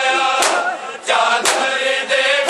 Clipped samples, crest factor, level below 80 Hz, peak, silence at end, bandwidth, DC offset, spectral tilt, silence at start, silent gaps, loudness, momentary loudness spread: under 0.1%; 16 dB; -72 dBFS; 0 dBFS; 0 s; 13 kHz; under 0.1%; 0.5 dB/octave; 0 s; none; -16 LUFS; 5 LU